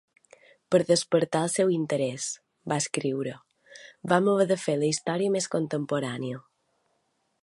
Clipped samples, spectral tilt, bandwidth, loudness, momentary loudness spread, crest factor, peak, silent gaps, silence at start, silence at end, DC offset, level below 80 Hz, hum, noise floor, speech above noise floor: under 0.1%; -4.5 dB/octave; 11.5 kHz; -27 LUFS; 11 LU; 22 dB; -6 dBFS; none; 0.7 s; 1.05 s; under 0.1%; -72 dBFS; none; -74 dBFS; 48 dB